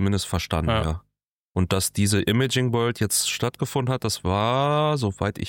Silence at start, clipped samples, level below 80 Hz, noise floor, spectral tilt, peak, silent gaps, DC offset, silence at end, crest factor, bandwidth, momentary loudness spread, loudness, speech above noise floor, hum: 0 s; under 0.1%; -40 dBFS; -69 dBFS; -4.5 dB/octave; -8 dBFS; 1.30-1.51 s; under 0.1%; 0 s; 16 dB; 17 kHz; 5 LU; -23 LUFS; 46 dB; none